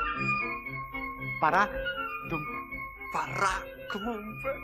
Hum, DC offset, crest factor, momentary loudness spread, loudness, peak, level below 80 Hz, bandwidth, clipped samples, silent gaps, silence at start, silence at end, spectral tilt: none; under 0.1%; 20 dB; 10 LU; -31 LUFS; -12 dBFS; -50 dBFS; 13.5 kHz; under 0.1%; none; 0 s; 0 s; -4.5 dB/octave